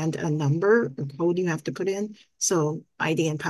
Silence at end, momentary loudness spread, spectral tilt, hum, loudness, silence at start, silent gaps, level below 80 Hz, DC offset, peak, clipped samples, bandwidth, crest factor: 0 s; 8 LU; -5 dB/octave; none; -25 LUFS; 0 s; none; -68 dBFS; under 0.1%; -8 dBFS; under 0.1%; 12.5 kHz; 16 dB